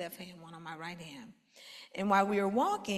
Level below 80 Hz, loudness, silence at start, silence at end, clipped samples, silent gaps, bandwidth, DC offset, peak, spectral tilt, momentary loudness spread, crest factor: -74 dBFS; -32 LUFS; 0 s; 0 s; under 0.1%; none; 14 kHz; under 0.1%; -14 dBFS; -5 dB/octave; 22 LU; 20 dB